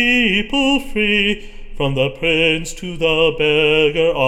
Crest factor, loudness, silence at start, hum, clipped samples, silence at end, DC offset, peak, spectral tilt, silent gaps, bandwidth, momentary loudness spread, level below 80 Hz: 14 dB; -16 LUFS; 0 s; none; under 0.1%; 0 s; under 0.1%; -2 dBFS; -4.5 dB/octave; none; 14.5 kHz; 8 LU; -32 dBFS